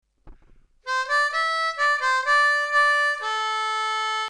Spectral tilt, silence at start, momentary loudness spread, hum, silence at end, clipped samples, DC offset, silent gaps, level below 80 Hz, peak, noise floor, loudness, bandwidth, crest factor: 2 dB/octave; 0.25 s; 6 LU; none; 0 s; under 0.1%; under 0.1%; none; -58 dBFS; -10 dBFS; -54 dBFS; -21 LUFS; 13 kHz; 12 dB